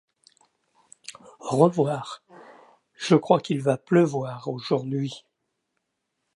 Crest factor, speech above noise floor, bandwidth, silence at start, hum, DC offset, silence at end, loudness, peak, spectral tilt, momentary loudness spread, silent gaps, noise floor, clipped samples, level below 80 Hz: 22 dB; 56 dB; 11.5 kHz; 1.1 s; none; under 0.1%; 1.15 s; -24 LUFS; -4 dBFS; -6.5 dB/octave; 22 LU; none; -79 dBFS; under 0.1%; -74 dBFS